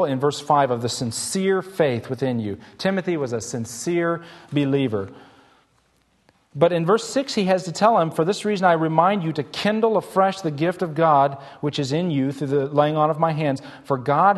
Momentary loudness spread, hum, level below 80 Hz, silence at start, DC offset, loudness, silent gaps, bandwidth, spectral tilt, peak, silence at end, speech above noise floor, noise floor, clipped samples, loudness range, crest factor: 9 LU; none; -64 dBFS; 0 s; under 0.1%; -22 LUFS; none; 12.5 kHz; -5.5 dB/octave; -4 dBFS; 0 s; 42 dB; -63 dBFS; under 0.1%; 5 LU; 18 dB